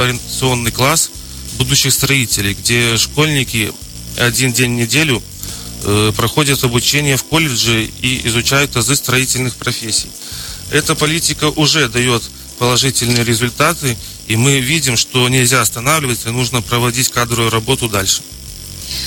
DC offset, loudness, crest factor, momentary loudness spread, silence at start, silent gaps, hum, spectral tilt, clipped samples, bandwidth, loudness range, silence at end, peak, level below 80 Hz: under 0.1%; -13 LUFS; 14 dB; 10 LU; 0 s; none; none; -3 dB/octave; under 0.1%; 17.5 kHz; 2 LU; 0 s; 0 dBFS; -36 dBFS